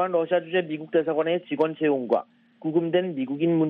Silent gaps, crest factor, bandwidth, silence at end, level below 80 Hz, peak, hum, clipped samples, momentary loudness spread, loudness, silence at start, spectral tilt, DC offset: none; 16 dB; 4.3 kHz; 0 s; -74 dBFS; -8 dBFS; none; under 0.1%; 4 LU; -25 LUFS; 0 s; -9.5 dB/octave; under 0.1%